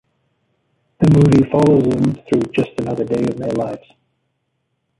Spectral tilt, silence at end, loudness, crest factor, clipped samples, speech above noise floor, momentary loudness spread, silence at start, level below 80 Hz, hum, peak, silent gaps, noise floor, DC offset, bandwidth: -8.5 dB/octave; 1.2 s; -16 LUFS; 16 dB; under 0.1%; 55 dB; 10 LU; 1 s; -44 dBFS; none; -2 dBFS; none; -70 dBFS; under 0.1%; 11.5 kHz